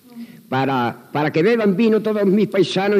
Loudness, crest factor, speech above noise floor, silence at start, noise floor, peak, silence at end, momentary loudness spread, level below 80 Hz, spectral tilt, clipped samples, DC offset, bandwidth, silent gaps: -18 LUFS; 12 dB; 21 dB; 0.15 s; -38 dBFS; -6 dBFS; 0 s; 8 LU; -80 dBFS; -7 dB/octave; under 0.1%; under 0.1%; 15 kHz; none